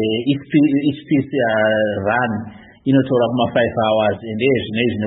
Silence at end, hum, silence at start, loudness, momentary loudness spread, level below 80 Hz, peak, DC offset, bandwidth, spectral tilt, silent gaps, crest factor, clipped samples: 0 s; none; 0 s; -18 LUFS; 4 LU; -54 dBFS; -2 dBFS; under 0.1%; 4.1 kHz; -12 dB/octave; none; 14 dB; under 0.1%